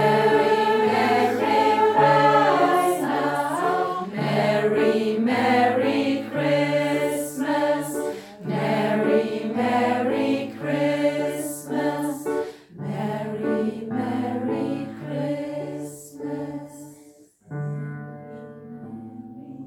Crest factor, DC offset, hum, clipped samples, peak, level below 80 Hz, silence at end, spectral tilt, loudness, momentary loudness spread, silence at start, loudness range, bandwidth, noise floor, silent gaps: 18 dB; under 0.1%; none; under 0.1%; -4 dBFS; -68 dBFS; 0 s; -5.5 dB/octave; -22 LUFS; 18 LU; 0 s; 13 LU; 18 kHz; -51 dBFS; none